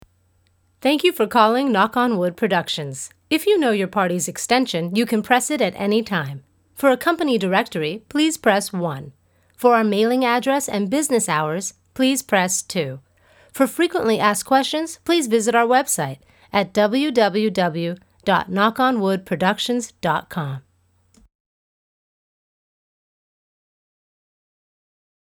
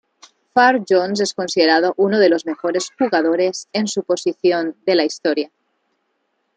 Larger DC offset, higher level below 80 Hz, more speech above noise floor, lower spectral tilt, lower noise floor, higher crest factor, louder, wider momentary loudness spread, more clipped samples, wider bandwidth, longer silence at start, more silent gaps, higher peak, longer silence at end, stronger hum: neither; first, -62 dBFS vs -70 dBFS; second, 42 dB vs 52 dB; about the same, -4 dB/octave vs -4 dB/octave; second, -62 dBFS vs -69 dBFS; about the same, 20 dB vs 16 dB; about the same, -20 LUFS vs -18 LUFS; first, 10 LU vs 7 LU; neither; first, over 20 kHz vs 9.4 kHz; first, 0.85 s vs 0.55 s; neither; about the same, 0 dBFS vs -2 dBFS; first, 4.7 s vs 1.1 s; neither